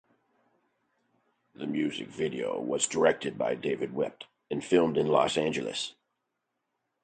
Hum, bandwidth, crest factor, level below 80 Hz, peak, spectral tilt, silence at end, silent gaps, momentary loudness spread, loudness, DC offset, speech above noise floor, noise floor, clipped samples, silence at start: none; 9.4 kHz; 22 dB; -68 dBFS; -8 dBFS; -4 dB/octave; 1.1 s; none; 11 LU; -29 LUFS; under 0.1%; 54 dB; -82 dBFS; under 0.1%; 1.6 s